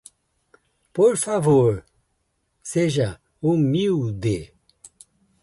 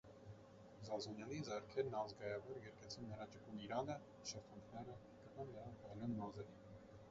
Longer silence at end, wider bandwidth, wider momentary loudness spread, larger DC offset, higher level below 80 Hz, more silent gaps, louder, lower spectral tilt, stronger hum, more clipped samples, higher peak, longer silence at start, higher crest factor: first, 1 s vs 0 s; first, 11.5 kHz vs 7.6 kHz; second, 12 LU vs 15 LU; neither; first, -52 dBFS vs -74 dBFS; neither; first, -21 LUFS vs -50 LUFS; first, -6.5 dB/octave vs -5 dB/octave; neither; neither; first, -6 dBFS vs -30 dBFS; first, 0.95 s vs 0.05 s; about the same, 16 dB vs 20 dB